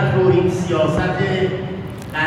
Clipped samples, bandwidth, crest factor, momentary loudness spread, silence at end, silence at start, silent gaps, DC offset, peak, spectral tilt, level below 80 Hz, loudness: under 0.1%; 12 kHz; 14 dB; 11 LU; 0 s; 0 s; none; under 0.1%; -4 dBFS; -7 dB/octave; -42 dBFS; -18 LUFS